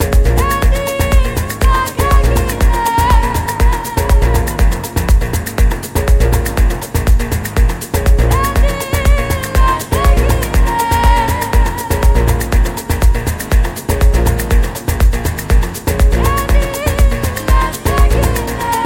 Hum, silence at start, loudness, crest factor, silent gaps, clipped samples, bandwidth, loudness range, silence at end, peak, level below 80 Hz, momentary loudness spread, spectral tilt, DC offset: none; 0 s; -14 LUFS; 10 dB; none; under 0.1%; 17 kHz; 1 LU; 0 s; 0 dBFS; -14 dBFS; 4 LU; -5.5 dB/octave; 0.2%